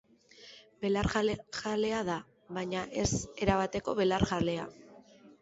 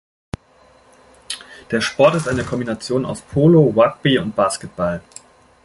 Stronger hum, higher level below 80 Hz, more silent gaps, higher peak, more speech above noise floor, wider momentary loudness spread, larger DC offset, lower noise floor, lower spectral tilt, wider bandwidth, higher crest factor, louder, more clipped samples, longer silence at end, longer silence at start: neither; about the same, -50 dBFS vs -46 dBFS; neither; second, -12 dBFS vs -2 dBFS; second, 25 dB vs 35 dB; second, 12 LU vs 18 LU; neither; first, -57 dBFS vs -52 dBFS; about the same, -5 dB/octave vs -6 dB/octave; second, 8.2 kHz vs 11.5 kHz; about the same, 20 dB vs 18 dB; second, -32 LUFS vs -17 LUFS; neither; second, 0.1 s vs 0.65 s; second, 0.4 s vs 1.3 s